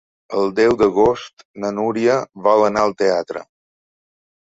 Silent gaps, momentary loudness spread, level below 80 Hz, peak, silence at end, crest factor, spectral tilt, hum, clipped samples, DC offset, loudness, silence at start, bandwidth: 1.33-1.37 s, 1.45-1.54 s; 13 LU; -50 dBFS; -2 dBFS; 1 s; 16 dB; -5.5 dB/octave; none; under 0.1%; under 0.1%; -18 LUFS; 0.3 s; 7.8 kHz